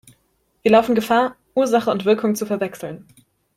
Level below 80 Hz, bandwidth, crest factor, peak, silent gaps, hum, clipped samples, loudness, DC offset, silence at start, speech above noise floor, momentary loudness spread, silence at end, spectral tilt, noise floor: -58 dBFS; 16 kHz; 18 dB; -2 dBFS; none; none; under 0.1%; -19 LUFS; under 0.1%; 0.65 s; 47 dB; 14 LU; 0.6 s; -5 dB/octave; -65 dBFS